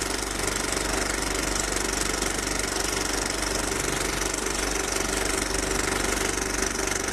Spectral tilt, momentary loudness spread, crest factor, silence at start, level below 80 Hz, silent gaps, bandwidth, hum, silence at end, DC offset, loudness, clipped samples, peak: -2 dB/octave; 1 LU; 18 dB; 0 s; -36 dBFS; none; 14.5 kHz; none; 0 s; under 0.1%; -25 LUFS; under 0.1%; -10 dBFS